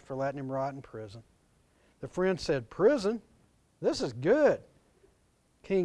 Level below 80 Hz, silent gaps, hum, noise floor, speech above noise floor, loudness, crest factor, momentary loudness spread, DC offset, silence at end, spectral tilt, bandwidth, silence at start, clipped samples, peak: -60 dBFS; none; none; -69 dBFS; 39 dB; -30 LUFS; 18 dB; 19 LU; under 0.1%; 0 s; -6 dB/octave; 11 kHz; 0.1 s; under 0.1%; -14 dBFS